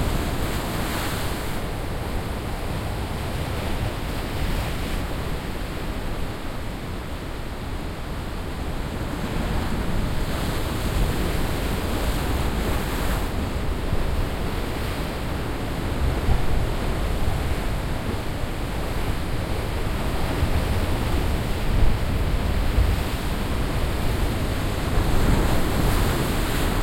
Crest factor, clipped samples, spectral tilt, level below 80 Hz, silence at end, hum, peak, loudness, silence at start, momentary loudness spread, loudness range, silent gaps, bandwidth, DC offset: 16 dB; under 0.1%; -5.5 dB/octave; -26 dBFS; 0 s; none; -6 dBFS; -27 LUFS; 0 s; 7 LU; 5 LU; none; 16.5 kHz; under 0.1%